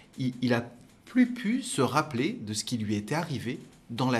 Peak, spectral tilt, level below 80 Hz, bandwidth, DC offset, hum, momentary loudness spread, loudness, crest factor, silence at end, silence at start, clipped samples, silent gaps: -10 dBFS; -5 dB/octave; -66 dBFS; 14 kHz; under 0.1%; none; 9 LU; -29 LUFS; 20 dB; 0 s; 0.15 s; under 0.1%; none